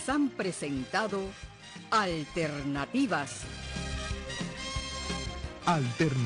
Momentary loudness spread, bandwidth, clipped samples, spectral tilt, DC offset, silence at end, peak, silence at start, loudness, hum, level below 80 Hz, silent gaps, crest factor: 10 LU; 10.5 kHz; under 0.1%; -5 dB/octave; under 0.1%; 0 s; -16 dBFS; 0 s; -32 LUFS; none; -46 dBFS; none; 16 dB